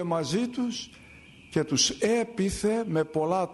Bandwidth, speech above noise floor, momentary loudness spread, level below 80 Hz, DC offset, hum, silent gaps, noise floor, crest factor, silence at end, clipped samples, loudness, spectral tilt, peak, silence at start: 11.5 kHz; 24 dB; 9 LU; -54 dBFS; under 0.1%; none; none; -51 dBFS; 16 dB; 0 s; under 0.1%; -27 LUFS; -4 dB/octave; -12 dBFS; 0 s